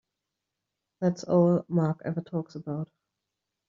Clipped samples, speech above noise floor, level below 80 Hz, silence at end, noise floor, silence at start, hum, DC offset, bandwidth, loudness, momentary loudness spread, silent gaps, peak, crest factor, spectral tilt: under 0.1%; 59 dB; -70 dBFS; 0.85 s; -86 dBFS; 1 s; none; under 0.1%; 7.4 kHz; -28 LUFS; 13 LU; none; -10 dBFS; 20 dB; -9.5 dB/octave